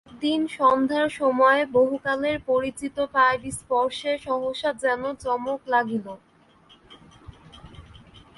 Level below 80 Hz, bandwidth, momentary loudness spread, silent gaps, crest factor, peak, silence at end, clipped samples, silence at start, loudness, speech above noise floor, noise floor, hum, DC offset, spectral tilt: -56 dBFS; 11.5 kHz; 9 LU; none; 18 dB; -6 dBFS; 0.2 s; under 0.1%; 0.1 s; -23 LUFS; 32 dB; -55 dBFS; none; under 0.1%; -4 dB/octave